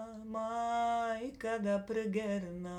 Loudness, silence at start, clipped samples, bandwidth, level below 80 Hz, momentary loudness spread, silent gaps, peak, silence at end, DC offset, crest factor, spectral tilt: -36 LUFS; 0 s; under 0.1%; 12.5 kHz; -64 dBFS; 6 LU; none; -24 dBFS; 0 s; under 0.1%; 12 dB; -6 dB/octave